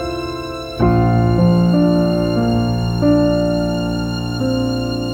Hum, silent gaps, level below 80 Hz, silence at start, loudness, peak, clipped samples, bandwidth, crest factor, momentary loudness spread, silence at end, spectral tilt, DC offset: none; none; -30 dBFS; 0 s; -16 LUFS; -2 dBFS; under 0.1%; 13 kHz; 14 dB; 9 LU; 0 s; -8 dB/octave; under 0.1%